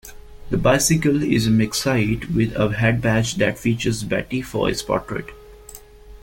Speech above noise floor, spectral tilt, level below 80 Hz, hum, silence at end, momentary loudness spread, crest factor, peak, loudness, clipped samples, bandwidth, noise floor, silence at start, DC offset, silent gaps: 23 dB; -5 dB/octave; -40 dBFS; none; 0.05 s; 10 LU; 16 dB; -4 dBFS; -20 LUFS; under 0.1%; 17 kHz; -42 dBFS; 0.05 s; under 0.1%; none